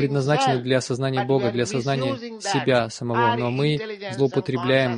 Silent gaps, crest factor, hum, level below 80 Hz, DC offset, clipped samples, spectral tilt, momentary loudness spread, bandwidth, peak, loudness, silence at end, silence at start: none; 16 dB; none; -60 dBFS; under 0.1%; under 0.1%; -5.5 dB/octave; 5 LU; 10.5 kHz; -6 dBFS; -23 LUFS; 0 s; 0 s